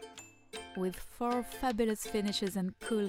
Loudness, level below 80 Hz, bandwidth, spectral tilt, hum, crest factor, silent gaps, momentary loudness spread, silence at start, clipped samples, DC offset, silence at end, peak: -35 LUFS; -56 dBFS; 17.5 kHz; -4.5 dB/octave; none; 18 dB; none; 14 LU; 0 s; under 0.1%; under 0.1%; 0 s; -18 dBFS